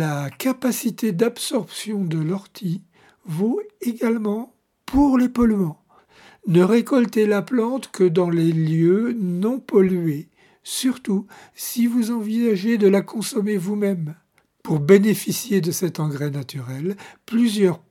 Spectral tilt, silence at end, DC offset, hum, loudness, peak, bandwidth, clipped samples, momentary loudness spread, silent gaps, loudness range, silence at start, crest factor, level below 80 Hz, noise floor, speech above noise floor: -6 dB/octave; 0.15 s; under 0.1%; none; -21 LUFS; 0 dBFS; 17 kHz; under 0.1%; 12 LU; none; 5 LU; 0 s; 20 dB; -48 dBFS; -52 dBFS; 31 dB